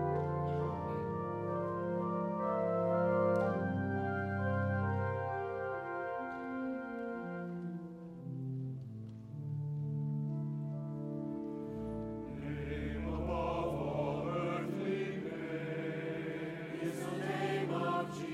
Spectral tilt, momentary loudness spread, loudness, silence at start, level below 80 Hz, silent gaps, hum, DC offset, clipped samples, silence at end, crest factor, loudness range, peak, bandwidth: -8 dB/octave; 8 LU; -38 LUFS; 0 s; -56 dBFS; none; none; under 0.1%; under 0.1%; 0 s; 16 dB; 7 LU; -20 dBFS; 13 kHz